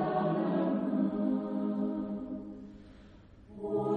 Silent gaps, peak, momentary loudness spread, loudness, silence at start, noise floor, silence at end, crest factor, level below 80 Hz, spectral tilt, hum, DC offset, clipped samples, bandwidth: none; -20 dBFS; 18 LU; -33 LUFS; 0 s; -54 dBFS; 0 s; 14 dB; -62 dBFS; -10 dB/octave; none; under 0.1%; under 0.1%; 4.7 kHz